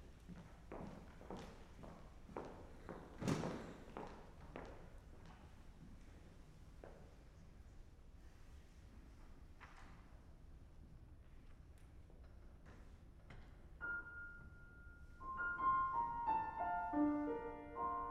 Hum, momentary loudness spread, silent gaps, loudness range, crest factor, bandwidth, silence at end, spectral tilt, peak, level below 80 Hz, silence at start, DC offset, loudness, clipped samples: none; 23 LU; none; 21 LU; 24 dB; 13.5 kHz; 0 s; -6.5 dB/octave; -24 dBFS; -60 dBFS; 0 s; under 0.1%; -45 LUFS; under 0.1%